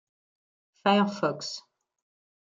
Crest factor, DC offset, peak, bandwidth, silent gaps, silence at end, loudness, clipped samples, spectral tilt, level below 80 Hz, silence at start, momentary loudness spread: 22 dB; under 0.1%; -10 dBFS; 7.6 kHz; none; 0.8 s; -27 LUFS; under 0.1%; -5 dB/octave; -78 dBFS; 0.85 s; 13 LU